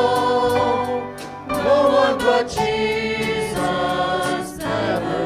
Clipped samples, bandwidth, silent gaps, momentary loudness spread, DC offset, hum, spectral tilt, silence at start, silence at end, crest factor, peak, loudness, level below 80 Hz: under 0.1%; 16 kHz; none; 9 LU; under 0.1%; none; -4.5 dB/octave; 0 s; 0 s; 14 dB; -4 dBFS; -20 LUFS; -44 dBFS